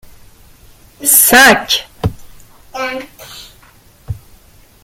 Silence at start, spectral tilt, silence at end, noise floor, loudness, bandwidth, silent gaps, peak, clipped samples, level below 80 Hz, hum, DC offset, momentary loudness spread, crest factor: 1 s; -1.5 dB/octave; 0.7 s; -45 dBFS; -10 LUFS; over 20 kHz; none; 0 dBFS; 0.1%; -40 dBFS; none; under 0.1%; 26 LU; 16 dB